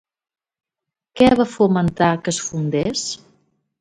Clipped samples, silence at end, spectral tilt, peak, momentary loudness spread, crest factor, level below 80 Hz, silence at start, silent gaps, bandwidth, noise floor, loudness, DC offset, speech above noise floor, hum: under 0.1%; 0.65 s; -5 dB/octave; -2 dBFS; 10 LU; 18 dB; -48 dBFS; 1.15 s; none; 11 kHz; -85 dBFS; -18 LUFS; under 0.1%; 67 dB; none